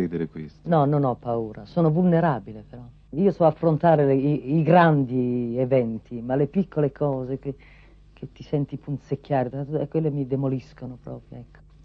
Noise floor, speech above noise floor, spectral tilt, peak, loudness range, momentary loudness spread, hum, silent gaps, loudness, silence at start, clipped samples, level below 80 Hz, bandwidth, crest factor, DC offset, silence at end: -50 dBFS; 27 dB; -10.5 dB/octave; -6 dBFS; 8 LU; 20 LU; none; none; -23 LUFS; 0 s; under 0.1%; -52 dBFS; 5.6 kHz; 18 dB; under 0.1%; 0.4 s